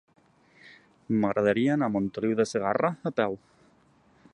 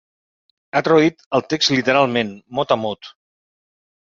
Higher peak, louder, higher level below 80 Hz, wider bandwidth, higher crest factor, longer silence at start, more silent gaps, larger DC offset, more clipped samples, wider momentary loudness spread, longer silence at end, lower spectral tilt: second, -8 dBFS vs 0 dBFS; second, -27 LUFS vs -18 LUFS; about the same, -64 dBFS vs -60 dBFS; first, 11 kHz vs 7.6 kHz; about the same, 20 dB vs 20 dB; about the same, 0.65 s vs 0.75 s; second, none vs 1.26-1.31 s; neither; neither; second, 6 LU vs 10 LU; about the same, 0.95 s vs 0.95 s; first, -6.5 dB/octave vs -4.5 dB/octave